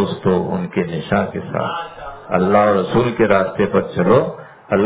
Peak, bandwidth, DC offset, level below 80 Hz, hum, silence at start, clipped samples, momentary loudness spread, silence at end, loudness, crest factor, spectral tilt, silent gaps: 0 dBFS; 4 kHz; under 0.1%; -46 dBFS; none; 0 s; under 0.1%; 11 LU; 0 s; -17 LUFS; 16 dB; -11 dB/octave; none